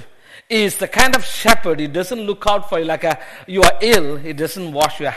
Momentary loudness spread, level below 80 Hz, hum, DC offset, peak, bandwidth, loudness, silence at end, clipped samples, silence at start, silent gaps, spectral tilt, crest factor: 10 LU; -36 dBFS; none; under 0.1%; 0 dBFS; over 20 kHz; -17 LUFS; 0 s; under 0.1%; 0 s; none; -3 dB/octave; 16 dB